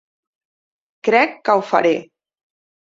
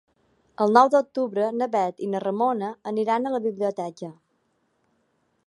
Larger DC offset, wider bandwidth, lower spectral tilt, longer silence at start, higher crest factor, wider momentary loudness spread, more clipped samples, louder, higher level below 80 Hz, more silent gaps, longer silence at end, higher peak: neither; second, 7.6 kHz vs 11.5 kHz; second, -5 dB/octave vs -6.5 dB/octave; first, 1.05 s vs 0.6 s; about the same, 20 dB vs 22 dB; second, 8 LU vs 13 LU; neither; first, -17 LUFS vs -24 LUFS; first, -68 dBFS vs -76 dBFS; neither; second, 0.95 s vs 1.35 s; about the same, -2 dBFS vs -2 dBFS